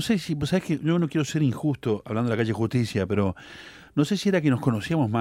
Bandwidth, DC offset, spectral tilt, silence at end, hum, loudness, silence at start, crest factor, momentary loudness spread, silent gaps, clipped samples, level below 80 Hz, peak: 16 kHz; under 0.1%; -6.5 dB/octave; 0 s; none; -25 LUFS; 0 s; 16 dB; 6 LU; none; under 0.1%; -54 dBFS; -10 dBFS